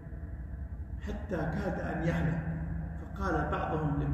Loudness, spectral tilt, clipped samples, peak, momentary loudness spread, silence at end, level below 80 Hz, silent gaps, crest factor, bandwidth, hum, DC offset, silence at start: -35 LUFS; -8.5 dB/octave; under 0.1%; -18 dBFS; 11 LU; 0 s; -40 dBFS; none; 16 dB; 8 kHz; none; under 0.1%; 0 s